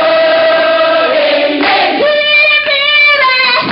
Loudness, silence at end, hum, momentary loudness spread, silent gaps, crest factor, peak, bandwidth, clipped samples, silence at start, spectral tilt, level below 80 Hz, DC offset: -8 LUFS; 0 s; none; 4 LU; none; 8 dB; 0 dBFS; 5.8 kHz; under 0.1%; 0 s; 1.5 dB/octave; -54 dBFS; under 0.1%